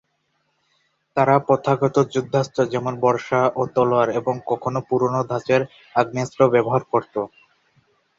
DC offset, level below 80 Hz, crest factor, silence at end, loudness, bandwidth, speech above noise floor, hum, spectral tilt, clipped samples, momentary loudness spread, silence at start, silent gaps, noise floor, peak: under 0.1%; -60 dBFS; 18 dB; 0.9 s; -20 LUFS; 7.8 kHz; 50 dB; none; -7 dB/octave; under 0.1%; 7 LU; 1.15 s; none; -70 dBFS; -4 dBFS